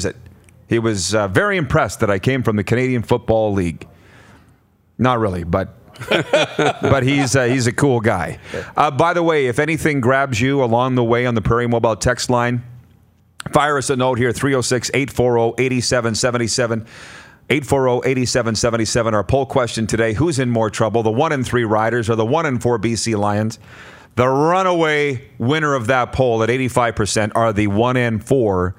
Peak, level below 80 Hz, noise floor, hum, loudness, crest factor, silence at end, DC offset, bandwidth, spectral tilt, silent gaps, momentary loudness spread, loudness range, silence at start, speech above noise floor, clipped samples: 0 dBFS; -44 dBFS; -54 dBFS; none; -17 LUFS; 18 dB; 0.05 s; under 0.1%; 16 kHz; -5 dB/octave; none; 6 LU; 2 LU; 0 s; 38 dB; under 0.1%